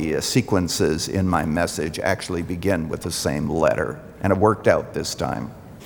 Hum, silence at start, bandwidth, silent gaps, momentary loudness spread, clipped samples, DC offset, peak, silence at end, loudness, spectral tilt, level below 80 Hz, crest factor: none; 0 s; over 20 kHz; none; 8 LU; under 0.1%; under 0.1%; -2 dBFS; 0 s; -22 LUFS; -5 dB/octave; -46 dBFS; 20 dB